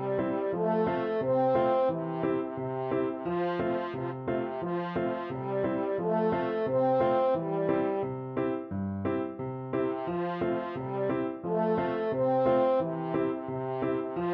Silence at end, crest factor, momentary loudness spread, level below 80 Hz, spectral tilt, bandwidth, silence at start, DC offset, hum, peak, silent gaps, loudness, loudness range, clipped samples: 0 s; 14 dB; 8 LU; -62 dBFS; -10 dB/octave; 5.4 kHz; 0 s; under 0.1%; none; -14 dBFS; none; -30 LUFS; 3 LU; under 0.1%